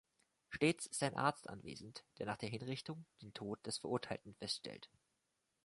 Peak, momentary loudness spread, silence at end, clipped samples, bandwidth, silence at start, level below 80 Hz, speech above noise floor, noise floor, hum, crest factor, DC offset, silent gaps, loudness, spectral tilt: -20 dBFS; 16 LU; 0.8 s; under 0.1%; 11.5 kHz; 0.5 s; -74 dBFS; 43 dB; -86 dBFS; none; 24 dB; under 0.1%; none; -43 LUFS; -4 dB/octave